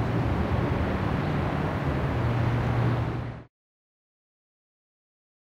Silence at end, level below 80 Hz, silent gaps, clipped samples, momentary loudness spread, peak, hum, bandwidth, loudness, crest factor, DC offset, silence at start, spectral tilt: 2.05 s; -38 dBFS; none; under 0.1%; 5 LU; -14 dBFS; none; 7.4 kHz; -27 LUFS; 14 dB; under 0.1%; 0 s; -8.5 dB/octave